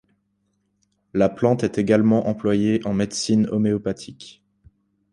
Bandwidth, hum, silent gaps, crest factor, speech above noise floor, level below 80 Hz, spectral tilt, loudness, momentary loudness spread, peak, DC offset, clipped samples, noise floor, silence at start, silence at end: 11 kHz; none; none; 18 dB; 50 dB; -54 dBFS; -6.5 dB/octave; -21 LUFS; 11 LU; -4 dBFS; under 0.1%; under 0.1%; -70 dBFS; 1.15 s; 0.8 s